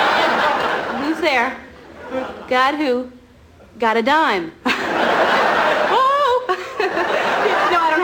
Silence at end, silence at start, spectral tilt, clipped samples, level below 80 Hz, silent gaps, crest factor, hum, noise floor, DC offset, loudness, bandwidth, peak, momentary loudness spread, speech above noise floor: 0 s; 0 s; -3.5 dB/octave; under 0.1%; -54 dBFS; none; 14 dB; none; -46 dBFS; under 0.1%; -17 LUFS; 18 kHz; -4 dBFS; 9 LU; 27 dB